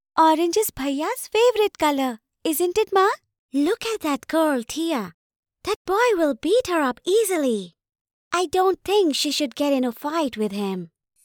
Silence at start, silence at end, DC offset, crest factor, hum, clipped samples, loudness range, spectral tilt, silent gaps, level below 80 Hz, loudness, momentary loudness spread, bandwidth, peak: 0.15 s; 0.4 s; under 0.1%; 16 dB; none; under 0.1%; 2 LU; -3.5 dB/octave; 3.39-3.49 s, 5.14-5.30 s, 5.36-5.43 s, 5.76-5.85 s, 8.01-8.05 s, 8.13-8.31 s; -58 dBFS; -22 LUFS; 10 LU; over 20 kHz; -8 dBFS